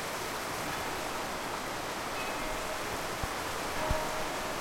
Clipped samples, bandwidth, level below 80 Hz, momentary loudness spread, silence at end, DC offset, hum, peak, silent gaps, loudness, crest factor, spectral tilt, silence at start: under 0.1%; 16.5 kHz; -46 dBFS; 3 LU; 0 s; under 0.1%; none; -16 dBFS; none; -35 LUFS; 18 dB; -3 dB/octave; 0 s